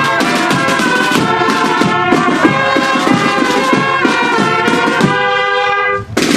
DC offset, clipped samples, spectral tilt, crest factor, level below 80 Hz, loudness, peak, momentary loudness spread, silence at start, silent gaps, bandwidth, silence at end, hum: under 0.1%; 0.1%; -4 dB/octave; 12 dB; -48 dBFS; -11 LUFS; 0 dBFS; 1 LU; 0 s; none; 14.5 kHz; 0 s; none